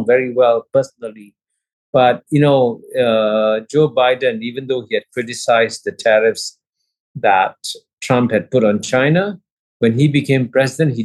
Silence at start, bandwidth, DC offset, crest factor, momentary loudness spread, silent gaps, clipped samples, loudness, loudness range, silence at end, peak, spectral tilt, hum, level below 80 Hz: 0 s; 12.5 kHz; under 0.1%; 14 dB; 11 LU; 1.73-1.93 s, 6.69-6.73 s, 7.00-7.15 s, 7.93-7.97 s, 9.52-9.80 s; under 0.1%; -16 LUFS; 2 LU; 0 s; -2 dBFS; -6 dB/octave; none; -64 dBFS